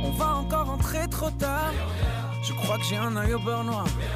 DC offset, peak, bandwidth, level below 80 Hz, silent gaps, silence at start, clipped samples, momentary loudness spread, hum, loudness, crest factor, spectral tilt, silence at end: under 0.1%; -14 dBFS; 16 kHz; -34 dBFS; none; 0 s; under 0.1%; 3 LU; none; -27 LUFS; 12 dB; -5 dB/octave; 0 s